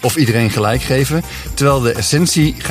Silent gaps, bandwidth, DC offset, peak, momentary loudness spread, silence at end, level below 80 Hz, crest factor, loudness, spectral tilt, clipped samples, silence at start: none; 15.5 kHz; under 0.1%; 0 dBFS; 4 LU; 0 s; -32 dBFS; 14 dB; -14 LUFS; -5 dB/octave; under 0.1%; 0 s